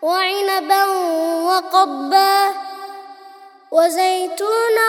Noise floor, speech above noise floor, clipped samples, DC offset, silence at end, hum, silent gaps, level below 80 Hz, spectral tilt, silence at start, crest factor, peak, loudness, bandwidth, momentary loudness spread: -42 dBFS; 27 dB; under 0.1%; under 0.1%; 0 s; none; none; -80 dBFS; 0 dB/octave; 0 s; 16 dB; -2 dBFS; -17 LUFS; 18.5 kHz; 14 LU